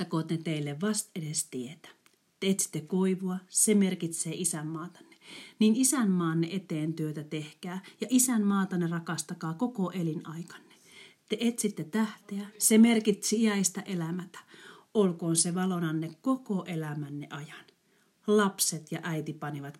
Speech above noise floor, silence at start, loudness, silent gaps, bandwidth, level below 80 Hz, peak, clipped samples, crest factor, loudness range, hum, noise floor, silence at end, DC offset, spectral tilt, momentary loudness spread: 39 dB; 0 s; -29 LUFS; none; 16 kHz; -84 dBFS; -10 dBFS; under 0.1%; 20 dB; 5 LU; none; -69 dBFS; 0.05 s; under 0.1%; -4.5 dB/octave; 16 LU